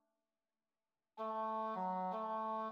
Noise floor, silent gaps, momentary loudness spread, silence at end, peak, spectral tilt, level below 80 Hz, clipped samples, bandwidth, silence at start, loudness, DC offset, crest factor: under -90 dBFS; none; 3 LU; 0 s; -30 dBFS; -8 dB/octave; under -90 dBFS; under 0.1%; 6.8 kHz; 1.15 s; -41 LUFS; under 0.1%; 12 dB